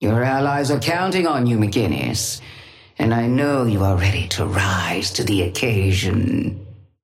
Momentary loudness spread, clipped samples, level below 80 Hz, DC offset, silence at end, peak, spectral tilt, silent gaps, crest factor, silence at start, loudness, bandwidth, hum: 5 LU; under 0.1%; -44 dBFS; under 0.1%; 0.25 s; -4 dBFS; -5 dB/octave; none; 14 dB; 0 s; -19 LUFS; 15.5 kHz; none